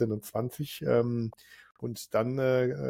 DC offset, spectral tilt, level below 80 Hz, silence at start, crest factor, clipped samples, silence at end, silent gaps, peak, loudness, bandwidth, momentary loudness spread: under 0.1%; -7 dB/octave; -64 dBFS; 0 s; 16 dB; under 0.1%; 0 s; 1.71-1.75 s; -14 dBFS; -30 LUFS; 17 kHz; 12 LU